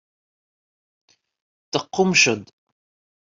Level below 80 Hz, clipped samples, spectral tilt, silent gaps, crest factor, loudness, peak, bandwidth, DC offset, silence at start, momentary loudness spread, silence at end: -66 dBFS; under 0.1%; -3 dB/octave; none; 24 dB; -19 LUFS; -2 dBFS; 7.8 kHz; under 0.1%; 1.75 s; 12 LU; 0.75 s